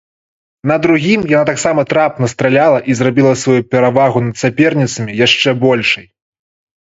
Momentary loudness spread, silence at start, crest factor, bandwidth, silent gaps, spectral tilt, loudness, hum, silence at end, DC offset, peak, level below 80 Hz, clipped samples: 5 LU; 0.65 s; 12 dB; 8 kHz; none; -5 dB/octave; -12 LUFS; none; 0.8 s; under 0.1%; 0 dBFS; -50 dBFS; under 0.1%